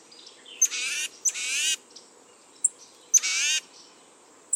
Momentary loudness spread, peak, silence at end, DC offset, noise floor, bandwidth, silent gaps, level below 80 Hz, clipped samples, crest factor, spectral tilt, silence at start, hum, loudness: 8 LU; -8 dBFS; 0 s; under 0.1%; -54 dBFS; 19 kHz; none; under -90 dBFS; under 0.1%; 22 dB; 5 dB/octave; 0.2 s; none; -24 LUFS